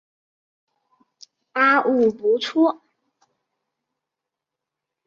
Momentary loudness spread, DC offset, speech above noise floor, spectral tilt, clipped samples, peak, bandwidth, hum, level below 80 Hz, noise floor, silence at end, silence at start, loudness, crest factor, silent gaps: 9 LU; under 0.1%; 67 dB; -4.5 dB/octave; under 0.1%; -6 dBFS; 7.4 kHz; none; -72 dBFS; -85 dBFS; 2.35 s; 1.55 s; -19 LUFS; 20 dB; none